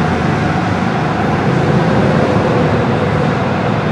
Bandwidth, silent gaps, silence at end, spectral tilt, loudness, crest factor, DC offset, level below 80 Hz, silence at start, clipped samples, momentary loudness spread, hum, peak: 10.5 kHz; none; 0 s; -7.5 dB/octave; -14 LUFS; 12 dB; under 0.1%; -34 dBFS; 0 s; under 0.1%; 3 LU; none; 0 dBFS